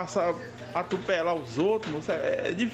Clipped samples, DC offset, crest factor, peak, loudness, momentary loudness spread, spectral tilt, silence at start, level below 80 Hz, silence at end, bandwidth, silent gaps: under 0.1%; under 0.1%; 14 dB; -14 dBFS; -29 LUFS; 6 LU; -5.5 dB/octave; 0 s; -62 dBFS; 0 s; 10.5 kHz; none